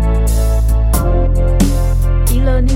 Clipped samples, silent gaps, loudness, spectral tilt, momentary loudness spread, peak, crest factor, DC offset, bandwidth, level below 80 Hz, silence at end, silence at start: under 0.1%; none; -15 LUFS; -6.5 dB/octave; 1 LU; 0 dBFS; 10 dB; under 0.1%; 16.5 kHz; -12 dBFS; 0 s; 0 s